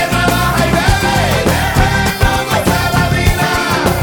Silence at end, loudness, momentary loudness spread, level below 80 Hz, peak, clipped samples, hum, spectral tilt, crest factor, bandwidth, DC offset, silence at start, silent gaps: 0 s; -13 LUFS; 1 LU; -22 dBFS; 0 dBFS; under 0.1%; none; -4.5 dB/octave; 12 dB; over 20 kHz; under 0.1%; 0 s; none